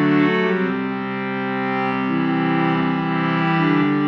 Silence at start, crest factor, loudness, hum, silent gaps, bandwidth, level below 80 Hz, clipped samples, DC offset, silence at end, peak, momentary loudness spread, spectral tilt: 0 s; 14 dB; -20 LUFS; none; none; 6.2 kHz; -60 dBFS; under 0.1%; under 0.1%; 0 s; -6 dBFS; 7 LU; -5.5 dB/octave